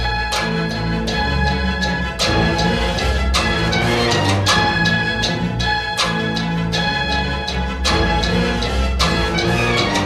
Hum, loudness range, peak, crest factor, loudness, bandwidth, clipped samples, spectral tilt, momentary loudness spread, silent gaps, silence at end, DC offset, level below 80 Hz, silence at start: none; 2 LU; -4 dBFS; 14 dB; -18 LUFS; 14.5 kHz; under 0.1%; -4.5 dB/octave; 4 LU; none; 0 s; under 0.1%; -26 dBFS; 0 s